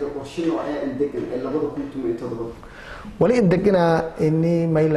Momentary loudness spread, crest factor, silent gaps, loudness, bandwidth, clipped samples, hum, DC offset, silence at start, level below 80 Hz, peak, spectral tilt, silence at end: 15 LU; 14 dB; none; -21 LUFS; 11 kHz; under 0.1%; none; under 0.1%; 0 s; -46 dBFS; -6 dBFS; -8 dB/octave; 0 s